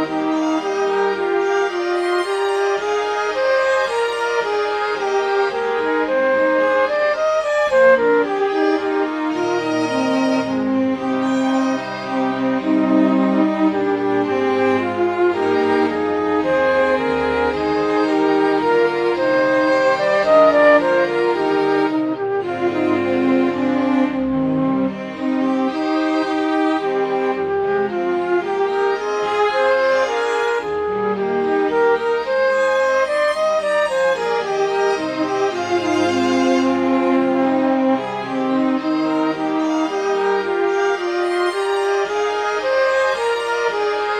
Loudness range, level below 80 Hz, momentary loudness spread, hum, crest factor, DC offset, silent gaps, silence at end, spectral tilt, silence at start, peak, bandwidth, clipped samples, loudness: 3 LU; -54 dBFS; 4 LU; none; 16 dB; under 0.1%; none; 0 s; -5 dB/octave; 0 s; -2 dBFS; 11 kHz; under 0.1%; -18 LUFS